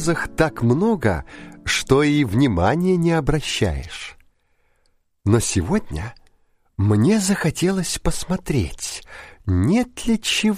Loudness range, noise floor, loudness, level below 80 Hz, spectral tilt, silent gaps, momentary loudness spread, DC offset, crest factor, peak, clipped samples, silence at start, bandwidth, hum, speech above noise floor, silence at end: 5 LU; -64 dBFS; -20 LUFS; -36 dBFS; -5 dB/octave; none; 14 LU; under 0.1%; 18 dB; -2 dBFS; under 0.1%; 0 s; 15.5 kHz; none; 44 dB; 0 s